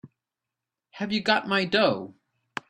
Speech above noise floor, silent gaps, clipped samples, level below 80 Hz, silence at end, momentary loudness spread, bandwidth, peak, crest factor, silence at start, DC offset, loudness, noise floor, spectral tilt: 63 dB; none; under 0.1%; -68 dBFS; 0.6 s; 15 LU; 10.5 kHz; -6 dBFS; 22 dB; 0.05 s; under 0.1%; -25 LUFS; -88 dBFS; -5 dB/octave